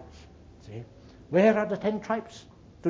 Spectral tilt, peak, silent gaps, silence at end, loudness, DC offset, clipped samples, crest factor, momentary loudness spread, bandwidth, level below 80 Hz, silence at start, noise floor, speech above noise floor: -7 dB/octave; -10 dBFS; none; 0 s; -26 LUFS; under 0.1%; under 0.1%; 20 dB; 25 LU; 7.6 kHz; -58 dBFS; 0 s; -50 dBFS; 24 dB